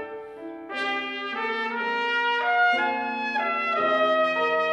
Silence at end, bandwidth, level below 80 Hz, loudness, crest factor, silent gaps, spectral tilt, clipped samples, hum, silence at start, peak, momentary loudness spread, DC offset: 0 s; 10 kHz; -76 dBFS; -24 LUFS; 14 dB; none; -3.5 dB/octave; under 0.1%; none; 0 s; -12 dBFS; 11 LU; under 0.1%